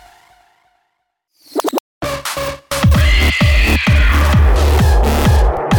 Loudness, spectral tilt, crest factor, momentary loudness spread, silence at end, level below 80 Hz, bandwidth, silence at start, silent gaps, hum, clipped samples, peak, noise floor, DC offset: -14 LUFS; -5.5 dB/octave; 12 dB; 10 LU; 0 s; -16 dBFS; 19 kHz; 1.55 s; 1.80-2.01 s; none; under 0.1%; 0 dBFS; -69 dBFS; under 0.1%